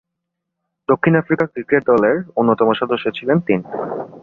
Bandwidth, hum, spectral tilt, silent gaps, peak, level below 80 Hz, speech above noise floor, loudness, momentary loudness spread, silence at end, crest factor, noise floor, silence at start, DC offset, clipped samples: 4.8 kHz; none; -9 dB/octave; none; -2 dBFS; -58 dBFS; 61 dB; -17 LUFS; 9 LU; 0.05 s; 16 dB; -78 dBFS; 0.9 s; under 0.1%; under 0.1%